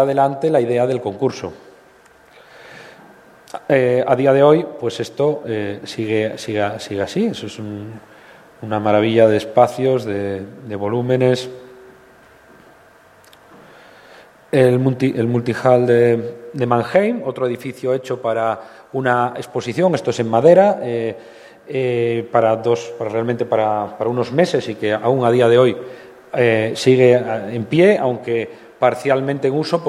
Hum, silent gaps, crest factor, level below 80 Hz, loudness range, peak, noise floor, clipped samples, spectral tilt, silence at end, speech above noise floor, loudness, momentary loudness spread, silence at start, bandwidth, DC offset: none; none; 18 dB; -62 dBFS; 7 LU; 0 dBFS; -48 dBFS; under 0.1%; -6.5 dB/octave; 0 s; 32 dB; -17 LUFS; 13 LU; 0 s; 14 kHz; under 0.1%